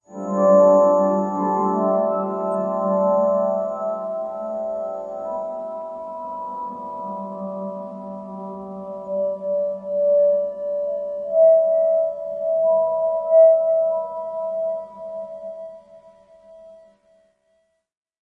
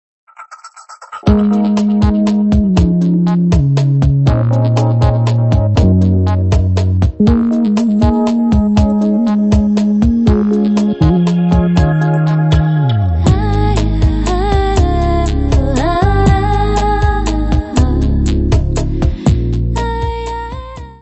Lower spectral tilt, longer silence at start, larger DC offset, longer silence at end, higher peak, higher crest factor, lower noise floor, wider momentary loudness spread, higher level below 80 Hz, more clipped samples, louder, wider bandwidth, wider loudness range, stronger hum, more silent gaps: first, -9.5 dB/octave vs -8 dB/octave; second, 0.1 s vs 0.4 s; second, under 0.1% vs 0.2%; first, 1.55 s vs 0.1 s; second, -4 dBFS vs 0 dBFS; about the same, 16 dB vs 12 dB; first, -67 dBFS vs -35 dBFS; first, 18 LU vs 4 LU; second, -68 dBFS vs -18 dBFS; neither; second, -21 LUFS vs -13 LUFS; second, 7.2 kHz vs 8.4 kHz; first, 13 LU vs 2 LU; neither; neither